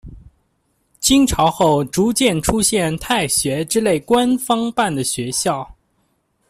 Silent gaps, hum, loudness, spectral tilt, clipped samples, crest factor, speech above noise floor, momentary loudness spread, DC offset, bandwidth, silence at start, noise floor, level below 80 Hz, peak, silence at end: none; none; -17 LUFS; -4 dB/octave; under 0.1%; 18 dB; 49 dB; 6 LU; under 0.1%; 16 kHz; 0.05 s; -65 dBFS; -40 dBFS; -2 dBFS; 0.8 s